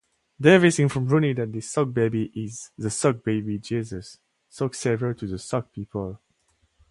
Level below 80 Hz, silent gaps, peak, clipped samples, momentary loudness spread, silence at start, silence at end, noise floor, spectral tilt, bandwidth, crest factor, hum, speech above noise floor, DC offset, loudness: -54 dBFS; none; -2 dBFS; under 0.1%; 16 LU; 0.4 s; 0.75 s; -68 dBFS; -6 dB/octave; 11.5 kHz; 22 dB; none; 44 dB; under 0.1%; -24 LUFS